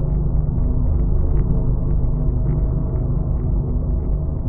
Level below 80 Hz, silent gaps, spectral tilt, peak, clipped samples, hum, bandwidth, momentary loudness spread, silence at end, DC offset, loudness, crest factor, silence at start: -20 dBFS; none; -16 dB/octave; -6 dBFS; under 0.1%; none; 2 kHz; 2 LU; 0 s; under 0.1%; -22 LUFS; 12 dB; 0 s